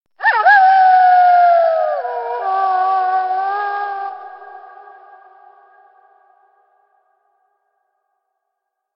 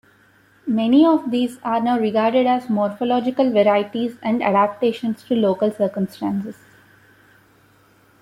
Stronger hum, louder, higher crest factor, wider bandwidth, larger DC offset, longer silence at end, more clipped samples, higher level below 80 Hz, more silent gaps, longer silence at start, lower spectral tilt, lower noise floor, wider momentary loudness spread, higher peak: neither; first, -13 LUFS vs -19 LUFS; about the same, 16 dB vs 16 dB; second, 5.6 kHz vs 13.5 kHz; neither; first, 4.3 s vs 1.7 s; neither; second, under -90 dBFS vs -64 dBFS; neither; second, 0.2 s vs 0.65 s; second, -2 dB/octave vs -7 dB/octave; first, -76 dBFS vs -55 dBFS; first, 16 LU vs 9 LU; first, 0 dBFS vs -4 dBFS